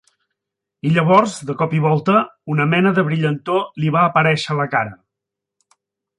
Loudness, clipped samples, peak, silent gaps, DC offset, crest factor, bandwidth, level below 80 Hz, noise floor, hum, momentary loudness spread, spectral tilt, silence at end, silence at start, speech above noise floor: -17 LUFS; under 0.1%; -2 dBFS; none; under 0.1%; 16 dB; 11 kHz; -60 dBFS; -83 dBFS; none; 8 LU; -6.5 dB/octave; 1.25 s; 0.85 s; 66 dB